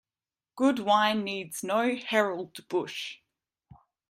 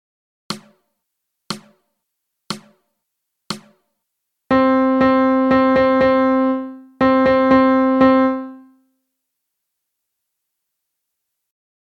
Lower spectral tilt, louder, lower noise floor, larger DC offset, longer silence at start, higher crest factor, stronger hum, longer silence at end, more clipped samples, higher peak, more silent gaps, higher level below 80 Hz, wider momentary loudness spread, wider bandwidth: second, -4 dB/octave vs -6 dB/octave; second, -28 LUFS vs -15 LUFS; first, under -90 dBFS vs -77 dBFS; neither; about the same, 0.55 s vs 0.5 s; about the same, 20 dB vs 16 dB; neither; second, 0.95 s vs 3.4 s; neither; second, -10 dBFS vs -2 dBFS; neither; second, -74 dBFS vs -50 dBFS; second, 12 LU vs 18 LU; first, 15.5 kHz vs 11 kHz